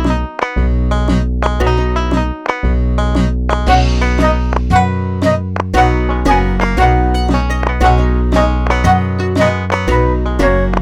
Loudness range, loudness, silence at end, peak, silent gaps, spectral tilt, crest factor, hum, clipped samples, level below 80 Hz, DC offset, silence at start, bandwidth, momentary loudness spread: 2 LU; -14 LUFS; 0 s; -2 dBFS; none; -7 dB/octave; 12 dB; none; under 0.1%; -16 dBFS; under 0.1%; 0 s; 10 kHz; 4 LU